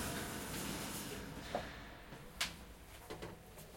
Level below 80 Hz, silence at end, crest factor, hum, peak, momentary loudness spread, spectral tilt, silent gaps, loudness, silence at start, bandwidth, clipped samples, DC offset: -58 dBFS; 0 s; 26 dB; none; -20 dBFS; 12 LU; -3 dB/octave; none; -45 LUFS; 0 s; 16.5 kHz; under 0.1%; under 0.1%